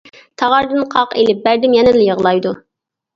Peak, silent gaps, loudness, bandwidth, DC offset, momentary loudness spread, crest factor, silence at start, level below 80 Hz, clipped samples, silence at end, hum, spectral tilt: 0 dBFS; none; -13 LUFS; 7.4 kHz; under 0.1%; 8 LU; 14 dB; 0.4 s; -50 dBFS; under 0.1%; 0.55 s; none; -6 dB/octave